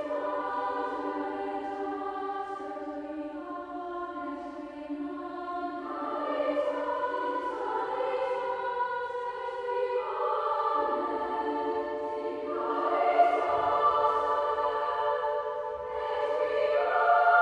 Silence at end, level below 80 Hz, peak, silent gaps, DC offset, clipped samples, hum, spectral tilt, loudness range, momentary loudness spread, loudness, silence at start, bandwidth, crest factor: 0 s; -66 dBFS; -10 dBFS; none; under 0.1%; under 0.1%; none; -5 dB/octave; 9 LU; 12 LU; -30 LUFS; 0 s; 9.6 kHz; 20 dB